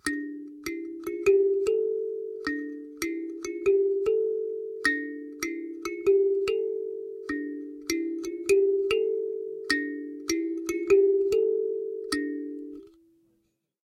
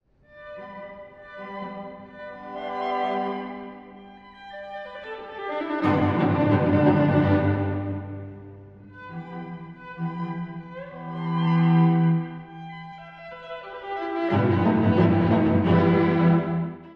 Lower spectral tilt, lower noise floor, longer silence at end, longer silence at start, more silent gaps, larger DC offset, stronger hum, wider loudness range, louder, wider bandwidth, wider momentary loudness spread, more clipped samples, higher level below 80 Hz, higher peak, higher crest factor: second, -3 dB/octave vs -10 dB/octave; first, -73 dBFS vs -47 dBFS; first, 0.95 s vs 0 s; second, 0.05 s vs 0.35 s; neither; neither; neither; second, 2 LU vs 10 LU; second, -28 LUFS vs -23 LUFS; first, 16 kHz vs 5.4 kHz; second, 13 LU vs 21 LU; neither; second, -62 dBFS vs -56 dBFS; about the same, -8 dBFS vs -6 dBFS; about the same, 18 dB vs 18 dB